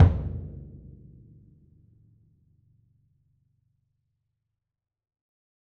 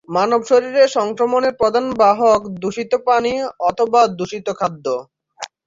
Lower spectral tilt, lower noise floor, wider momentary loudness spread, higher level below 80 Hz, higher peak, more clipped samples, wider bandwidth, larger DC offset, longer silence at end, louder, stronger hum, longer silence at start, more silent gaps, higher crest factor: first, -10 dB/octave vs -4.5 dB/octave; first, -84 dBFS vs -36 dBFS; first, 25 LU vs 10 LU; first, -40 dBFS vs -56 dBFS; about the same, -4 dBFS vs -2 dBFS; neither; second, 3.8 kHz vs 7.8 kHz; neither; first, 4.95 s vs 0.2 s; second, -29 LUFS vs -17 LUFS; neither; about the same, 0 s vs 0.1 s; neither; first, 26 dB vs 14 dB